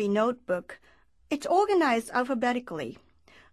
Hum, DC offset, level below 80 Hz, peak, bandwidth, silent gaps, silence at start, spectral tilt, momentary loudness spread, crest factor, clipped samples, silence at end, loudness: none; under 0.1%; -66 dBFS; -12 dBFS; 13 kHz; none; 0 s; -5 dB/octave; 13 LU; 16 dB; under 0.1%; 0.6 s; -27 LUFS